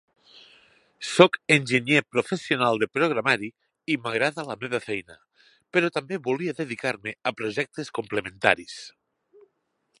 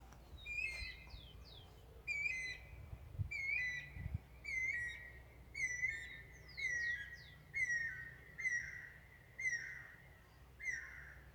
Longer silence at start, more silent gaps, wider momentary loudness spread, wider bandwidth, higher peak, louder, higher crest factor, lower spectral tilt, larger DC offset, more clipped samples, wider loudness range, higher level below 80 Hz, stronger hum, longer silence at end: first, 1 s vs 0 s; neither; second, 13 LU vs 19 LU; second, 11.5 kHz vs over 20 kHz; first, 0 dBFS vs -30 dBFS; first, -24 LUFS vs -42 LUFS; first, 26 dB vs 16 dB; first, -4.5 dB/octave vs -2.5 dB/octave; neither; neither; first, 6 LU vs 3 LU; second, -68 dBFS vs -60 dBFS; neither; first, 1.1 s vs 0 s